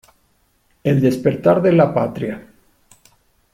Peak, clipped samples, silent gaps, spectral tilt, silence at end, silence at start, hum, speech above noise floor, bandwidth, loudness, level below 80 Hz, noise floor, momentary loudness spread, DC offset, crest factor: -2 dBFS; under 0.1%; none; -8.5 dB/octave; 1.15 s; 0.85 s; none; 45 dB; 15.5 kHz; -17 LUFS; -54 dBFS; -61 dBFS; 13 LU; under 0.1%; 18 dB